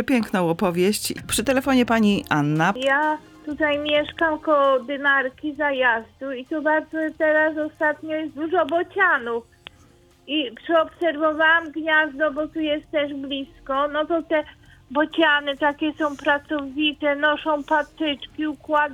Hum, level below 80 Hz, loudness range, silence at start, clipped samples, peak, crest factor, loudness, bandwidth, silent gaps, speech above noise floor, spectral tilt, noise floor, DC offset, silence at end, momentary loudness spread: none; -54 dBFS; 3 LU; 0 s; under 0.1%; -4 dBFS; 18 dB; -22 LUFS; 19 kHz; none; 32 dB; -4.5 dB/octave; -54 dBFS; under 0.1%; 0 s; 9 LU